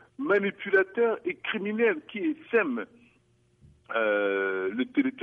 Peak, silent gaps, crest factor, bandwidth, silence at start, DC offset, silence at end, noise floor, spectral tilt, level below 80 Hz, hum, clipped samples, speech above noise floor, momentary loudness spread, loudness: -12 dBFS; none; 18 dB; 4.6 kHz; 0.2 s; under 0.1%; 0 s; -65 dBFS; -7.5 dB/octave; -72 dBFS; none; under 0.1%; 38 dB; 6 LU; -27 LUFS